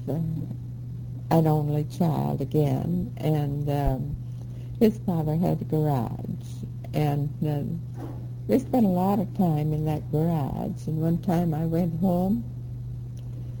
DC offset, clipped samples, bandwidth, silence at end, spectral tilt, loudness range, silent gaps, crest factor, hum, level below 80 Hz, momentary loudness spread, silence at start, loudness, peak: under 0.1%; under 0.1%; 18 kHz; 0 s; -9 dB/octave; 2 LU; none; 18 dB; none; -44 dBFS; 13 LU; 0 s; -27 LUFS; -8 dBFS